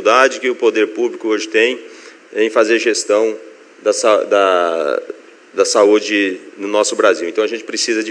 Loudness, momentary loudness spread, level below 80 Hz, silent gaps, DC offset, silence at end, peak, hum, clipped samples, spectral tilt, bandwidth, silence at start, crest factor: -15 LUFS; 10 LU; -76 dBFS; none; under 0.1%; 0 s; 0 dBFS; none; under 0.1%; -1.5 dB/octave; 10.5 kHz; 0 s; 16 dB